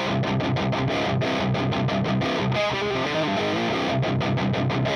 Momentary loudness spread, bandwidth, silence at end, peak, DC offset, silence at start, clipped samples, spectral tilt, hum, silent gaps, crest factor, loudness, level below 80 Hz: 0 LU; 9.6 kHz; 0 s; -14 dBFS; under 0.1%; 0 s; under 0.1%; -6.5 dB/octave; none; none; 10 dB; -24 LUFS; -48 dBFS